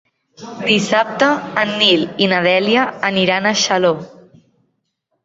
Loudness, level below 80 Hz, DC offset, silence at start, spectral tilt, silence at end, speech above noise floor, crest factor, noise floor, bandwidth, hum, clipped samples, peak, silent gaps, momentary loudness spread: -15 LUFS; -60 dBFS; under 0.1%; 0.4 s; -3.5 dB/octave; 1.15 s; 55 dB; 16 dB; -70 dBFS; 8 kHz; none; under 0.1%; 0 dBFS; none; 5 LU